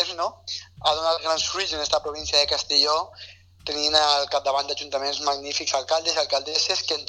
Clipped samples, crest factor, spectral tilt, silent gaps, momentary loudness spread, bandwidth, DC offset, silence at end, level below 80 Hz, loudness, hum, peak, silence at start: under 0.1%; 20 dB; -0.5 dB/octave; none; 10 LU; 11 kHz; under 0.1%; 0 s; -54 dBFS; -22 LUFS; none; -4 dBFS; 0 s